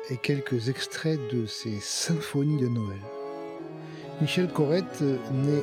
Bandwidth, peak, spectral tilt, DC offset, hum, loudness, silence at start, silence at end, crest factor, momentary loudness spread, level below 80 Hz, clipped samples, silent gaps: 16 kHz; -12 dBFS; -5.5 dB/octave; under 0.1%; none; -29 LUFS; 0 s; 0 s; 16 dB; 12 LU; -72 dBFS; under 0.1%; none